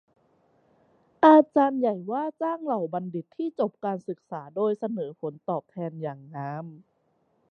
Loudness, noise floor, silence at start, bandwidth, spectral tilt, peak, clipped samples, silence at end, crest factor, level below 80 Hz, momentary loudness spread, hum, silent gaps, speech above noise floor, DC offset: -26 LUFS; -70 dBFS; 1.2 s; 6.2 kHz; -9 dB/octave; -4 dBFS; under 0.1%; 0.75 s; 22 dB; -82 dBFS; 18 LU; none; none; 44 dB; under 0.1%